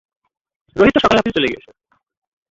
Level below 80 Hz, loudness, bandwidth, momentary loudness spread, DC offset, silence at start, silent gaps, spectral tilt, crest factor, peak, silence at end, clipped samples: -44 dBFS; -15 LUFS; 7.8 kHz; 17 LU; under 0.1%; 0.75 s; none; -5.5 dB/octave; 18 dB; -2 dBFS; 0.95 s; under 0.1%